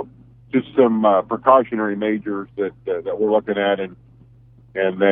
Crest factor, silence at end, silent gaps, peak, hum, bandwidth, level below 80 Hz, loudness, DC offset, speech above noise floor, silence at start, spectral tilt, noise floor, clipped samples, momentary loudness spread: 20 dB; 0 s; none; 0 dBFS; none; 3.8 kHz; -58 dBFS; -19 LUFS; under 0.1%; 30 dB; 0 s; -10 dB/octave; -48 dBFS; under 0.1%; 11 LU